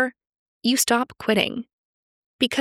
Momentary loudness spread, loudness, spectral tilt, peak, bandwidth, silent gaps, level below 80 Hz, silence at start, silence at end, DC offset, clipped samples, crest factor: 7 LU; -22 LUFS; -2.5 dB/octave; -4 dBFS; 17 kHz; 0.36-0.61 s, 1.73-2.39 s; -62 dBFS; 0 s; 0 s; under 0.1%; under 0.1%; 22 dB